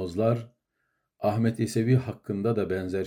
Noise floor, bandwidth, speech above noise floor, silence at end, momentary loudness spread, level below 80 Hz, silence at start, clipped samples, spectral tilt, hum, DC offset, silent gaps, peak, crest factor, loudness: -78 dBFS; 15.5 kHz; 51 dB; 0 s; 6 LU; -66 dBFS; 0 s; under 0.1%; -7.5 dB/octave; none; under 0.1%; none; -12 dBFS; 16 dB; -27 LUFS